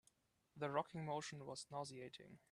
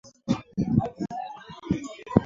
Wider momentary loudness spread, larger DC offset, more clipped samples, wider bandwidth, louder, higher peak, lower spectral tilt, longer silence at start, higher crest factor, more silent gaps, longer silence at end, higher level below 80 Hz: about the same, 12 LU vs 11 LU; neither; neither; first, 12.5 kHz vs 7.6 kHz; second, -48 LUFS vs -29 LUFS; second, -26 dBFS vs -2 dBFS; second, -4.5 dB/octave vs -8 dB/octave; first, 0.55 s vs 0.05 s; about the same, 22 dB vs 26 dB; neither; first, 0.15 s vs 0 s; second, -84 dBFS vs -48 dBFS